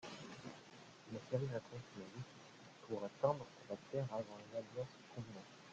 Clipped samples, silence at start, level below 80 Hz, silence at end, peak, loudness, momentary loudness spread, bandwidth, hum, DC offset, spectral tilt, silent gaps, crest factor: under 0.1%; 0 s; -78 dBFS; 0 s; -22 dBFS; -47 LUFS; 18 LU; 9 kHz; none; under 0.1%; -6.5 dB/octave; none; 26 dB